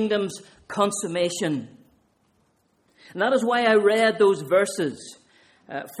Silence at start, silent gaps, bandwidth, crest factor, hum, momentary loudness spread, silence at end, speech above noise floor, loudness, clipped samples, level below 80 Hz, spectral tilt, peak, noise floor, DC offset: 0 s; none; 15.5 kHz; 18 dB; none; 18 LU; 0 s; 44 dB; -22 LUFS; under 0.1%; -70 dBFS; -4 dB/octave; -6 dBFS; -66 dBFS; under 0.1%